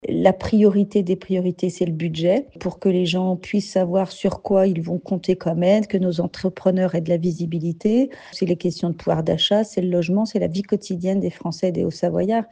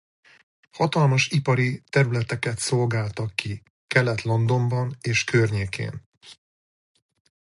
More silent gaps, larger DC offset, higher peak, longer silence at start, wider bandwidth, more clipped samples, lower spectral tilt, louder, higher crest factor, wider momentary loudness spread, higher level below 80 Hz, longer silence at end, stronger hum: second, none vs 3.70-3.88 s, 6.06-6.12 s; neither; about the same, 0 dBFS vs -2 dBFS; second, 0.05 s vs 0.75 s; second, 9.2 kHz vs 11.5 kHz; neither; first, -7 dB/octave vs -5.5 dB/octave; about the same, -21 LUFS vs -23 LUFS; about the same, 20 dB vs 22 dB; second, 6 LU vs 9 LU; about the same, -52 dBFS vs -54 dBFS; second, 0.05 s vs 1.2 s; neither